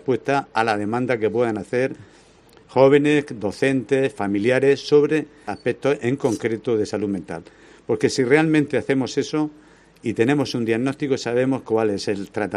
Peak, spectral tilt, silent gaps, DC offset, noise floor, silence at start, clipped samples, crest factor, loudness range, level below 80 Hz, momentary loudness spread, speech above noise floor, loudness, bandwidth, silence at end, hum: -2 dBFS; -6 dB/octave; none; under 0.1%; -51 dBFS; 0.05 s; under 0.1%; 20 dB; 3 LU; -60 dBFS; 10 LU; 30 dB; -21 LUFS; 11.5 kHz; 0 s; none